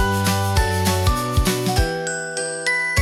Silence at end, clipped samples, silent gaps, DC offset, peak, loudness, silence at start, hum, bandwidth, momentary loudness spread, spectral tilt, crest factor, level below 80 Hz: 0 s; under 0.1%; none; under 0.1%; -6 dBFS; -20 LUFS; 0 s; none; 17 kHz; 5 LU; -4 dB/octave; 12 dB; -28 dBFS